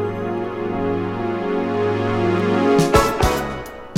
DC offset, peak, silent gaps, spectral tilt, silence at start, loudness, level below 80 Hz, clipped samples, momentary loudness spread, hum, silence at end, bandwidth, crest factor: under 0.1%; 0 dBFS; none; -6 dB/octave; 0 s; -20 LUFS; -34 dBFS; under 0.1%; 9 LU; none; 0 s; 17 kHz; 20 dB